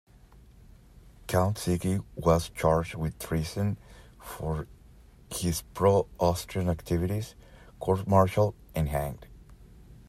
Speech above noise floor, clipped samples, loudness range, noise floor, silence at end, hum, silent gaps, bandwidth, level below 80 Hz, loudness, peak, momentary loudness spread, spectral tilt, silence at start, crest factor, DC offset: 27 dB; under 0.1%; 3 LU; -54 dBFS; 0.15 s; none; none; 16 kHz; -46 dBFS; -29 LUFS; -8 dBFS; 13 LU; -6.5 dB/octave; 1.05 s; 22 dB; under 0.1%